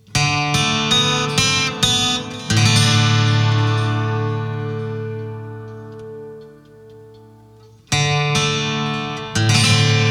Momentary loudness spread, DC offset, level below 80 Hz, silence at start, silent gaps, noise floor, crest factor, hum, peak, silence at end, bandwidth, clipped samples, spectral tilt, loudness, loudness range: 19 LU; under 0.1%; -46 dBFS; 0.1 s; none; -46 dBFS; 18 dB; none; -2 dBFS; 0 s; 13.5 kHz; under 0.1%; -3.5 dB/octave; -17 LUFS; 13 LU